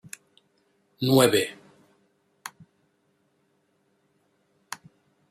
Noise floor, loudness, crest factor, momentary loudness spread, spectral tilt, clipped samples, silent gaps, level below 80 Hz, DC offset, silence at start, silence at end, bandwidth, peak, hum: -70 dBFS; -22 LUFS; 24 dB; 24 LU; -4.5 dB/octave; under 0.1%; none; -70 dBFS; under 0.1%; 1 s; 3.8 s; 16 kHz; -6 dBFS; none